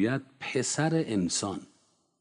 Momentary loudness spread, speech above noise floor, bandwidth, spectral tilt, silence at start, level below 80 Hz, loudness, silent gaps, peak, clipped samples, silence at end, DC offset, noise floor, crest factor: 8 LU; 39 dB; 10.5 kHz; -4.5 dB/octave; 0 s; -68 dBFS; -29 LUFS; none; -14 dBFS; under 0.1%; 0.55 s; under 0.1%; -68 dBFS; 16 dB